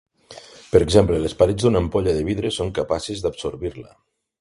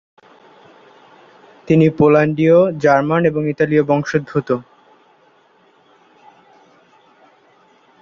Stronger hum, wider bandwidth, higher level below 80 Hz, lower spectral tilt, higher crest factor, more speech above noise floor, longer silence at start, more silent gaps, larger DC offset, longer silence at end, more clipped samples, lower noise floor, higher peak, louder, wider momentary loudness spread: neither; first, 11.5 kHz vs 7.2 kHz; first, -38 dBFS vs -56 dBFS; second, -6 dB/octave vs -8 dB/octave; about the same, 20 dB vs 16 dB; second, 24 dB vs 40 dB; second, 0.3 s vs 1.65 s; neither; neither; second, 0.55 s vs 3.4 s; neither; second, -44 dBFS vs -54 dBFS; about the same, 0 dBFS vs -2 dBFS; second, -20 LUFS vs -15 LUFS; first, 13 LU vs 8 LU